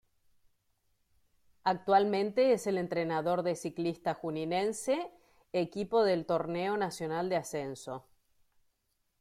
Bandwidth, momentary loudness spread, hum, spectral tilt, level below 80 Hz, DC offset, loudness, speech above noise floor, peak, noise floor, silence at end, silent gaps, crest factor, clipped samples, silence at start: 15 kHz; 10 LU; none; -5.5 dB/octave; -72 dBFS; under 0.1%; -32 LUFS; 47 dB; -14 dBFS; -78 dBFS; 1.2 s; none; 18 dB; under 0.1%; 1.65 s